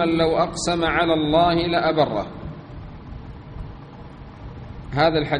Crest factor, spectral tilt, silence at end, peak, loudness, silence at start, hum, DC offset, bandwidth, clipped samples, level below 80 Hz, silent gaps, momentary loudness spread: 18 dB; -5.5 dB/octave; 0 s; -4 dBFS; -20 LUFS; 0 s; none; under 0.1%; 10 kHz; under 0.1%; -40 dBFS; none; 21 LU